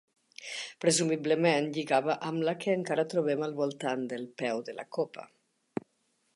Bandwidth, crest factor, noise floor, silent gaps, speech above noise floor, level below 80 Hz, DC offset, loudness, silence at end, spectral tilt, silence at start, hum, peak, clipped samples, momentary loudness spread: 11.5 kHz; 20 dB; -75 dBFS; none; 45 dB; -80 dBFS; under 0.1%; -30 LUFS; 1.15 s; -4 dB/octave; 0.4 s; none; -12 dBFS; under 0.1%; 14 LU